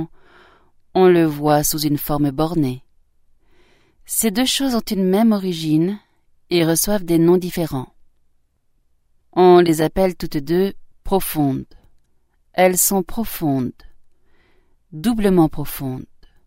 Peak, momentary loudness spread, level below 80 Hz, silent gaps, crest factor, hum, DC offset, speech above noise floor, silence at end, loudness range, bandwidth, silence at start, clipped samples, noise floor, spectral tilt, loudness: 0 dBFS; 13 LU; -40 dBFS; none; 20 dB; none; under 0.1%; 44 dB; 0.45 s; 3 LU; 16.5 kHz; 0 s; under 0.1%; -61 dBFS; -5 dB/octave; -18 LUFS